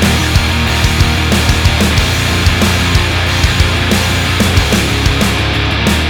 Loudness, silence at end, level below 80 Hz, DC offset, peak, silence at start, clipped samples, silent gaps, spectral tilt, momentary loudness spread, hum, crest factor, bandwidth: -11 LUFS; 0 s; -18 dBFS; under 0.1%; 0 dBFS; 0 s; under 0.1%; none; -4 dB/octave; 2 LU; none; 10 dB; 19.5 kHz